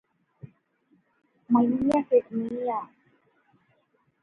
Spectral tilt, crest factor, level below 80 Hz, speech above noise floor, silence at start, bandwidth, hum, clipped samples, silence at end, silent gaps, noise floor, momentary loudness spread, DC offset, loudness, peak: -8.5 dB/octave; 18 dB; -64 dBFS; 45 dB; 0.45 s; 7.4 kHz; none; under 0.1%; 1.35 s; none; -69 dBFS; 11 LU; under 0.1%; -25 LUFS; -10 dBFS